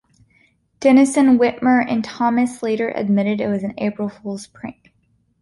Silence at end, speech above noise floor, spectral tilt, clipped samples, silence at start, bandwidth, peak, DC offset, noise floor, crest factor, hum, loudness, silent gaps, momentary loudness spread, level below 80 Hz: 0.7 s; 45 dB; -6 dB/octave; under 0.1%; 0.8 s; 11.5 kHz; -2 dBFS; under 0.1%; -63 dBFS; 16 dB; none; -18 LUFS; none; 17 LU; -58 dBFS